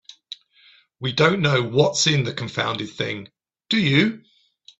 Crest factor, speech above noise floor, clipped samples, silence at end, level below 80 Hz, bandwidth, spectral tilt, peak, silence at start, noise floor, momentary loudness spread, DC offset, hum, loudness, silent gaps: 20 dB; 34 dB; under 0.1%; 0.6 s; -58 dBFS; 8.2 kHz; -4.5 dB/octave; -2 dBFS; 0.3 s; -55 dBFS; 21 LU; under 0.1%; none; -21 LUFS; none